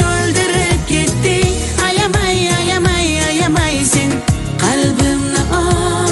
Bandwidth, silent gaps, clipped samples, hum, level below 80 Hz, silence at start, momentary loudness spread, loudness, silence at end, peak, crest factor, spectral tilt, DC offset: 12 kHz; none; under 0.1%; none; -26 dBFS; 0 s; 2 LU; -14 LUFS; 0 s; 0 dBFS; 14 dB; -4 dB/octave; under 0.1%